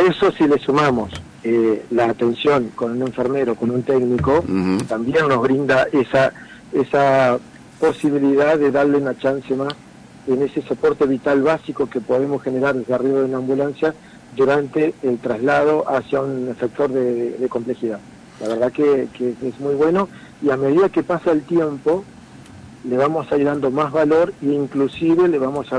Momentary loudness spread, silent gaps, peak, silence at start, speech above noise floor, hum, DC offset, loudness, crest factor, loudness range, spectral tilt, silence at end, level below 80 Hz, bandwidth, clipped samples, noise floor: 8 LU; none; -8 dBFS; 0 s; 22 dB; none; under 0.1%; -19 LUFS; 12 dB; 3 LU; -7 dB/octave; 0 s; -52 dBFS; 10.5 kHz; under 0.1%; -40 dBFS